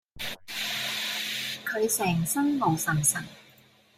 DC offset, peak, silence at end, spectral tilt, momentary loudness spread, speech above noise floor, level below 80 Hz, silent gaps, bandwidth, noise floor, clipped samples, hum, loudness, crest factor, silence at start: under 0.1%; -10 dBFS; 0.55 s; -3 dB/octave; 10 LU; 32 dB; -60 dBFS; none; 16 kHz; -58 dBFS; under 0.1%; none; -27 LUFS; 18 dB; 0.15 s